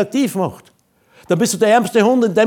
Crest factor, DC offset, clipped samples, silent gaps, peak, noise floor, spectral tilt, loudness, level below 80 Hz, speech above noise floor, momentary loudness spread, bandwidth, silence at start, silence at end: 14 dB; under 0.1%; under 0.1%; none; -2 dBFS; -53 dBFS; -5 dB/octave; -16 LUFS; -62 dBFS; 38 dB; 9 LU; 19.5 kHz; 0 s; 0 s